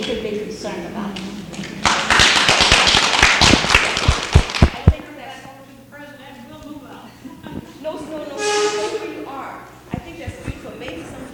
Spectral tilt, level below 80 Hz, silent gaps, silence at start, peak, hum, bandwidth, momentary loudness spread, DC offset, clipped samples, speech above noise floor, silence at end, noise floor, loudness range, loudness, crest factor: -3 dB/octave; -30 dBFS; none; 0 s; 0 dBFS; none; 18.5 kHz; 25 LU; under 0.1%; under 0.1%; 14 dB; 0 s; -40 dBFS; 14 LU; -15 LUFS; 20 dB